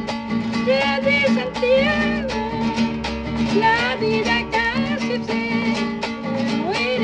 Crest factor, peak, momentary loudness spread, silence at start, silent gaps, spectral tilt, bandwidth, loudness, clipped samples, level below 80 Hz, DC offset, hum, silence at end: 14 dB; -6 dBFS; 7 LU; 0 s; none; -5.5 dB/octave; 9.4 kHz; -20 LUFS; under 0.1%; -42 dBFS; under 0.1%; none; 0 s